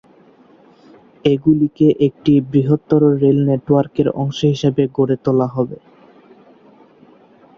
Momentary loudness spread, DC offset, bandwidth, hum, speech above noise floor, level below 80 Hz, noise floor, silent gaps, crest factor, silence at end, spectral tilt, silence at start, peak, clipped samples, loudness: 5 LU; under 0.1%; 7 kHz; none; 33 dB; -52 dBFS; -48 dBFS; none; 16 dB; 1.85 s; -8.5 dB/octave; 1.25 s; -2 dBFS; under 0.1%; -16 LUFS